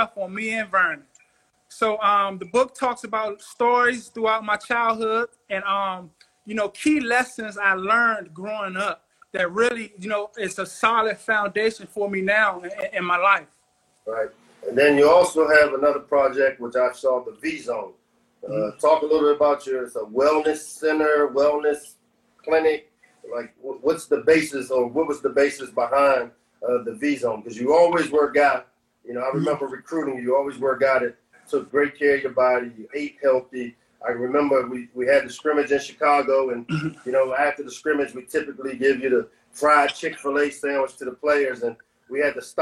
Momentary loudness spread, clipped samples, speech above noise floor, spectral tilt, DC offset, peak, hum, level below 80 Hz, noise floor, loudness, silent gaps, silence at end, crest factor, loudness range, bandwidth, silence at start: 12 LU; under 0.1%; 43 dB; -4.5 dB/octave; under 0.1%; -2 dBFS; none; -62 dBFS; -65 dBFS; -22 LUFS; none; 0 s; 20 dB; 4 LU; 12.5 kHz; 0 s